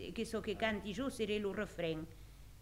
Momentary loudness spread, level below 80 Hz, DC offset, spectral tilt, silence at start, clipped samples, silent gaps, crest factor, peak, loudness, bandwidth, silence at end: 14 LU; -58 dBFS; under 0.1%; -5 dB/octave; 0 s; under 0.1%; none; 20 dB; -20 dBFS; -40 LUFS; 16 kHz; 0 s